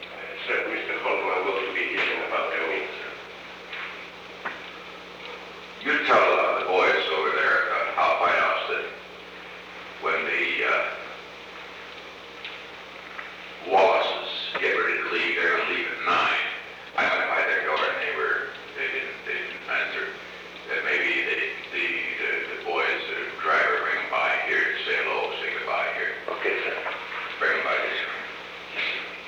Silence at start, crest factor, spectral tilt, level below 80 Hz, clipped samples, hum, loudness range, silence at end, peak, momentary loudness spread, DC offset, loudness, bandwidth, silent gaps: 0 s; 18 dB; -3 dB/octave; -66 dBFS; under 0.1%; none; 5 LU; 0 s; -8 dBFS; 17 LU; under 0.1%; -25 LUFS; 19.5 kHz; none